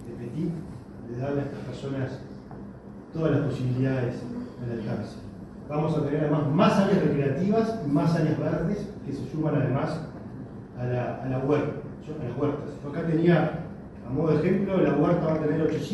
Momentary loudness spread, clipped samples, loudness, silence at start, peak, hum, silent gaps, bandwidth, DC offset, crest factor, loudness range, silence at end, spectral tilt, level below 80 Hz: 17 LU; under 0.1%; -27 LUFS; 0 s; -8 dBFS; none; none; 11.5 kHz; under 0.1%; 18 dB; 6 LU; 0 s; -8.5 dB/octave; -52 dBFS